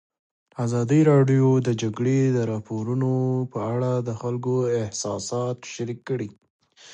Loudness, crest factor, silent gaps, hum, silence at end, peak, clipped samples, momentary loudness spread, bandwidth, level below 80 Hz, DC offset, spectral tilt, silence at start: -24 LUFS; 18 dB; 6.50-6.59 s; none; 0 s; -6 dBFS; under 0.1%; 12 LU; 9.2 kHz; -62 dBFS; under 0.1%; -7 dB/octave; 0.6 s